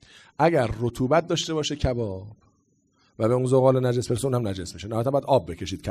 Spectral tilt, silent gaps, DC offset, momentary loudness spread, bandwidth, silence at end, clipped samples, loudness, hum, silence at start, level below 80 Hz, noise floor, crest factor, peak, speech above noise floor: -6 dB/octave; none; under 0.1%; 12 LU; 14.5 kHz; 0 s; under 0.1%; -24 LUFS; none; 0.4 s; -44 dBFS; -66 dBFS; 18 dB; -6 dBFS; 43 dB